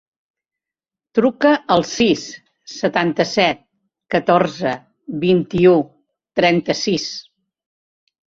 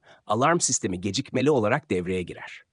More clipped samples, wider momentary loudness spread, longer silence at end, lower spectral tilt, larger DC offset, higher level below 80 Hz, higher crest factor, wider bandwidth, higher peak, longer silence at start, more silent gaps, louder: neither; first, 16 LU vs 10 LU; first, 1.05 s vs 0.15 s; about the same, -5 dB/octave vs -4 dB/octave; neither; first, -56 dBFS vs -64 dBFS; about the same, 18 dB vs 18 dB; second, 7.8 kHz vs 10.5 kHz; first, -2 dBFS vs -8 dBFS; first, 1.15 s vs 0.3 s; neither; first, -17 LUFS vs -24 LUFS